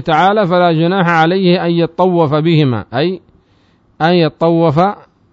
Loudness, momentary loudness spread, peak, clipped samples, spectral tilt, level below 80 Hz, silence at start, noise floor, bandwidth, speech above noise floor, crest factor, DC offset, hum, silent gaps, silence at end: -12 LUFS; 6 LU; 0 dBFS; under 0.1%; -8 dB/octave; -50 dBFS; 0 s; -52 dBFS; 7.2 kHz; 41 dB; 12 dB; under 0.1%; none; none; 0.35 s